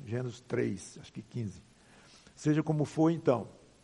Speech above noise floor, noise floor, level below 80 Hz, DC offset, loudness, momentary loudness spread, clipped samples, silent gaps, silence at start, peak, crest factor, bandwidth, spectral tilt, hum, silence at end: 27 dB; -59 dBFS; -68 dBFS; under 0.1%; -33 LUFS; 15 LU; under 0.1%; none; 0 s; -12 dBFS; 20 dB; 11 kHz; -7.5 dB/octave; none; 0.3 s